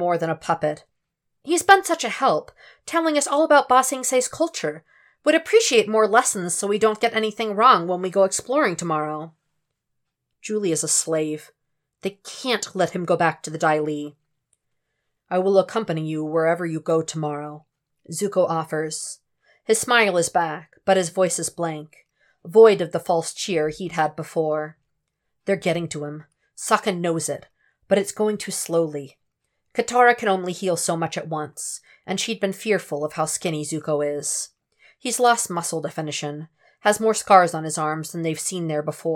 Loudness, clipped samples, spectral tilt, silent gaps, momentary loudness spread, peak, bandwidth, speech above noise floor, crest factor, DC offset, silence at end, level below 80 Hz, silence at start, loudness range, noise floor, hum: -21 LUFS; under 0.1%; -3.5 dB/octave; none; 15 LU; 0 dBFS; 17.5 kHz; 56 dB; 22 dB; under 0.1%; 0 s; -68 dBFS; 0 s; 6 LU; -77 dBFS; none